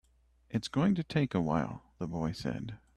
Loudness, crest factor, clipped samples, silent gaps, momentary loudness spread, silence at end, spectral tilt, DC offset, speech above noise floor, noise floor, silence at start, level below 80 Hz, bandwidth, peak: -33 LUFS; 16 dB; under 0.1%; none; 10 LU; 0.2 s; -7 dB/octave; under 0.1%; 33 dB; -66 dBFS; 0.5 s; -56 dBFS; 12 kHz; -16 dBFS